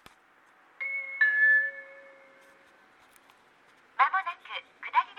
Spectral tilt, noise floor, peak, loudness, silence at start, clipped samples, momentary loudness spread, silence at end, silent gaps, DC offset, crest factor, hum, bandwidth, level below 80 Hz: -0.5 dB/octave; -61 dBFS; -10 dBFS; -26 LUFS; 0.8 s; under 0.1%; 20 LU; 0.05 s; none; under 0.1%; 22 dB; none; 11 kHz; -86 dBFS